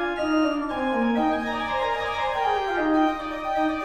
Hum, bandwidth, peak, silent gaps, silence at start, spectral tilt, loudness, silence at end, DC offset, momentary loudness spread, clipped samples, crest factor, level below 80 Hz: none; 9.2 kHz; -12 dBFS; none; 0 s; -5 dB/octave; -24 LUFS; 0 s; under 0.1%; 4 LU; under 0.1%; 14 dB; -48 dBFS